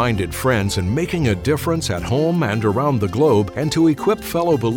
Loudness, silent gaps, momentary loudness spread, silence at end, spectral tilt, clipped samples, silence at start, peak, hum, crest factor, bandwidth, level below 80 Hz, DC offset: -19 LUFS; none; 4 LU; 0 s; -6 dB/octave; under 0.1%; 0 s; -6 dBFS; none; 12 dB; 17.5 kHz; -40 dBFS; under 0.1%